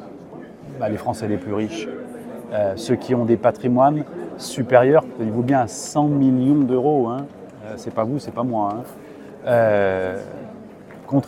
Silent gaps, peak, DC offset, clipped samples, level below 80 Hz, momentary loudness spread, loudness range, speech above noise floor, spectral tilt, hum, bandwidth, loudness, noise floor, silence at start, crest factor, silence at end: none; 0 dBFS; under 0.1%; under 0.1%; -60 dBFS; 21 LU; 5 LU; 20 dB; -7 dB/octave; none; 15 kHz; -20 LUFS; -40 dBFS; 0 s; 20 dB; 0 s